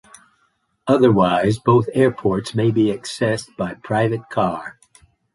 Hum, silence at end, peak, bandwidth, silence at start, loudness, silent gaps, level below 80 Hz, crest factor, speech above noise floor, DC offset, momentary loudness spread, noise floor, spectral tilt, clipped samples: none; 0.65 s; -2 dBFS; 11.5 kHz; 0.85 s; -19 LUFS; none; -52 dBFS; 18 dB; 48 dB; under 0.1%; 12 LU; -66 dBFS; -7 dB/octave; under 0.1%